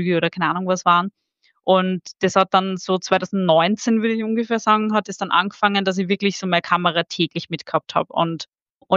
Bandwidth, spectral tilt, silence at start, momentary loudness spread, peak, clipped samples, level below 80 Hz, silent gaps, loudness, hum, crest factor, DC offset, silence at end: 7.8 kHz; -5 dB/octave; 0 s; 7 LU; -2 dBFS; under 0.1%; -70 dBFS; 8.48-8.52 s, 8.62-8.80 s; -20 LUFS; none; 18 dB; under 0.1%; 0 s